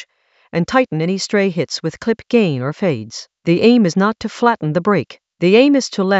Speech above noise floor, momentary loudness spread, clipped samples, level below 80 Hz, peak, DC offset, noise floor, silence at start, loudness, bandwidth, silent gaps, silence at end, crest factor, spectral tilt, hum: 34 dB; 10 LU; under 0.1%; -56 dBFS; 0 dBFS; under 0.1%; -49 dBFS; 0 s; -16 LUFS; 8.2 kHz; none; 0 s; 16 dB; -6 dB/octave; none